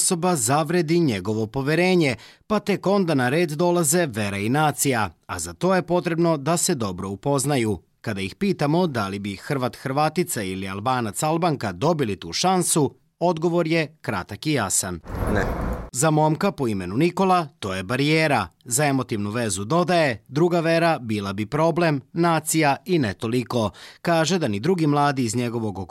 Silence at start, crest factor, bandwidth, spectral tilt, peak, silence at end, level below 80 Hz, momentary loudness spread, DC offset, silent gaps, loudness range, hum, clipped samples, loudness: 0 s; 12 dB; 16 kHz; -5 dB/octave; -10 dBFS; 0.05 s; -44 dBFS; 8 LU; under 0.1%; none; 3 LU; none; under 0.1%; -22 LUFS